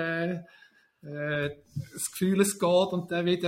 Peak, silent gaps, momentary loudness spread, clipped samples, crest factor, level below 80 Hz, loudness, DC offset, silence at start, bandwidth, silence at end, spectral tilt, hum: -8 dBFS; none; 15 LU; under 0.1%; 20 dB; -66 dBFS; -28 LUFS; under 0.1%; 0 s; 16.5 kHz; 0 s; -4.5 dB/octave; none